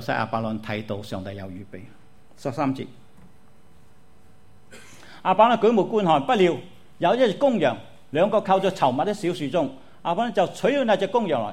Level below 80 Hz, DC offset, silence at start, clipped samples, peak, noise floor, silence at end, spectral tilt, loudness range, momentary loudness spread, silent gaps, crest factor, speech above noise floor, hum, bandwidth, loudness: -60 dBFS; 0.6%; 0 s; under 0.1%; -4 dBFS; -56 dBFS; 0 s; -6 dB/octave; 13 LU; 15 LU; none; 18 dB; 34 dB; none; 15 kHz; -23 LUFS